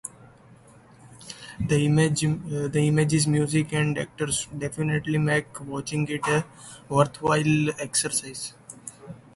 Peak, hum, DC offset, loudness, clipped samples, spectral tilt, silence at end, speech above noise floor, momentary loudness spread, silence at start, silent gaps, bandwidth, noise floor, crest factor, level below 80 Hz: -6 dBFS; none; under 0.1%; -25 LUFS; under 0.1%; -5 dB/octave; 0.2 s; 27 dB; 19 LU; 0.05 s; none; 11.5 kHz; -52 dBFS; 20 dB; -54 dBFS